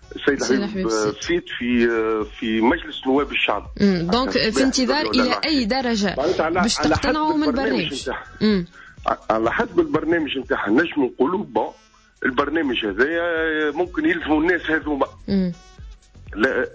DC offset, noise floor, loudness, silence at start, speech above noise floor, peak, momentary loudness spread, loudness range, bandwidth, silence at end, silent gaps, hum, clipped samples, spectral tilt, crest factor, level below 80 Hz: under 0.1%; -41 dBFS; -21 LUFS; 0.1 s; 21 dB; -6 dBFS; 6 LU; 3 LU; 8 kHz; 0 s; none; none; under 0.1%; -4.5 dB/octave; 14 dB; -42 dBFS